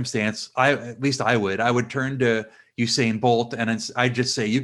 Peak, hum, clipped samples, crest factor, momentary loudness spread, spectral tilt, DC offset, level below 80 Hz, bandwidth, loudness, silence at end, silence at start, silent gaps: -4 dBFS; none; under 0.1%; 20 dB; 5 LU; -4.5 dB/octave; under 0.1%; -64 dBFS; 12 kHz; -22 LUFS; 0 s; 0 s; none